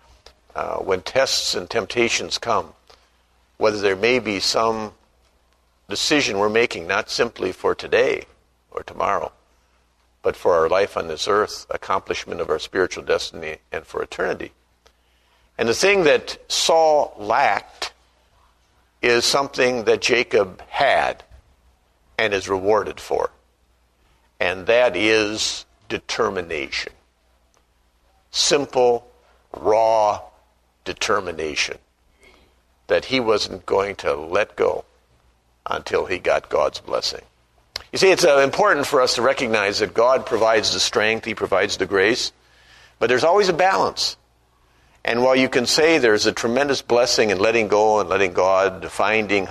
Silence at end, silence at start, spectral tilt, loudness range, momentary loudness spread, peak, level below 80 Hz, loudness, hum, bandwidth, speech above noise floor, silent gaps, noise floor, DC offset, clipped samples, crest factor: 0 s; 0.55 s; -2.5 dB/octave; 6 LU; 12 LU; 0 dBFS; -52 dBFS; -20 LUFS; 60 Hz at -55 dBFS; 13.5 kHz; 42 dB; none; -61 dBFS; under 0.1%; under 0.1%; 20 dB